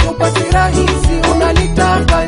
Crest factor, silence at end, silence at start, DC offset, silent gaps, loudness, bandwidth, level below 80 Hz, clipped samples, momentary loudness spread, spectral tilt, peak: 10 dB; 0 s; 0 s; under 0.1%; none; -12 LUFS; 11 kHz; -16 dBFS; under 0.1%; 2 LU; -5.5 dB/octave; 0 dBFS